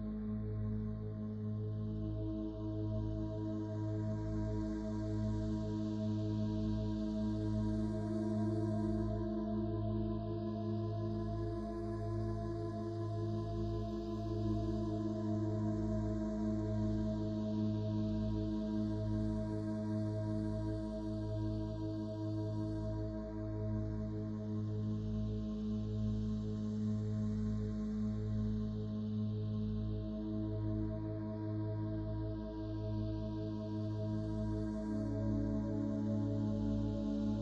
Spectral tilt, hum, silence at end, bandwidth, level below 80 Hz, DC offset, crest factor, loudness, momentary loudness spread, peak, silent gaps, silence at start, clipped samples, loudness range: -9.5 dB/octave; none; 0 s; 7.6 kHz; -48 dBFS; under 0.1%; 12 dB; -39 LUFS; 4 LU; -26 dBFS; none; 0 s; under 0.1%; 3 LU